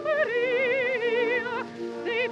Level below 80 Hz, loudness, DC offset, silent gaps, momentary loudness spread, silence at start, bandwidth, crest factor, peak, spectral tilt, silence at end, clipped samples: -78 dBFS; -26 LUFS; under 0.1%; none; 9 LU; 0 s; 8.2 kHz; 14 dB; -12 dBFS; -4.5 dB/octave; 0 s; under 0.1%